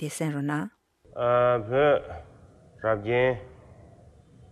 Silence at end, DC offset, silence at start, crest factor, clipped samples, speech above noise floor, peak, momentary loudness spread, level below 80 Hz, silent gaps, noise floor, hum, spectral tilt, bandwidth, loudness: 1 s; under 0.1%; 0 s; 16 dB; under 0.1%; 28 dB; -12 dBFS; 17 LU; -56 dBFS; none; -53 dBFS; none; -6 dB/octave; 14 kHz; -26 LUFS